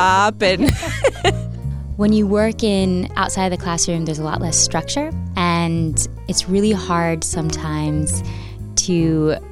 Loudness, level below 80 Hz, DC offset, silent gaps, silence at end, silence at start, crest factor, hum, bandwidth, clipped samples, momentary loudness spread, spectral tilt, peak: -18 LUFS; -32 dBFS; under 0.1%; none; 0 s; 0 s; 16 dB; none; 16 kHz; under 0.1%; 7 LU; -4.5 dB/octave; -2 dBFS